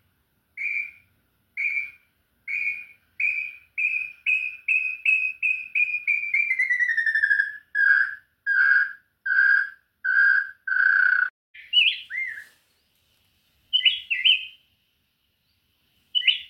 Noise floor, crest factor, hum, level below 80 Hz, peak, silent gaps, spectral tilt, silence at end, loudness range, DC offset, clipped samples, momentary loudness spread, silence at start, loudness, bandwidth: -71 dBFS; 18 dB; none; -76 dBFS; -6 dBFS; 11.30-11.54 s; 2.5 dB/octave; 0.05 s; 6 LU; under 0.1%; under 0.1%; 12 LU; 0.55 s; -22 LUFS; 11.5 kHz